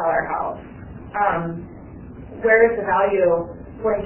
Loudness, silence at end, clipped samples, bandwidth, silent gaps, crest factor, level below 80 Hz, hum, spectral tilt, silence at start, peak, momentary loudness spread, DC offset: -20 LUFS; 0 s; under 0.1%; 3.2 kHz; none; 18 dB; -46 dBFS; none; -10 dB/octave; 0 s; -2 dBFS; 23 LU; under 0.1%